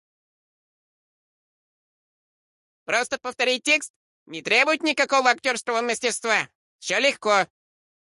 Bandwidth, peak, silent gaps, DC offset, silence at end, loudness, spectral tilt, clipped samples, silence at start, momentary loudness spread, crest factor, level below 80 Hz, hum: 11.5 kHz; -6 dBFS; 3.90-4.26 s, 6.55-6.79 s; under 0.1%; 0.6 s; -22 LUFS; -1 dB/octave; under 0.1%; 2.9 s; 15 LU; 20 dB; -76 dBFS; none